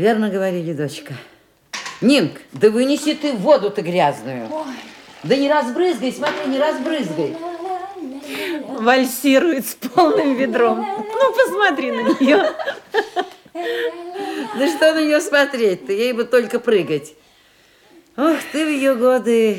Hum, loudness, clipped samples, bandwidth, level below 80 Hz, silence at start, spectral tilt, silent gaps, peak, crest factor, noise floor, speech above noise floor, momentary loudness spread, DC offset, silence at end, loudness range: none; -18 LUFS; under 0.1%; 18 kHz; -68 dBFS; 0 s; -4.5 dB/octave; none; 0 dBFS; 18 dB; -53 dBFS; 35 dB; 13 LU; under 0.1%; 0 s; 4 LU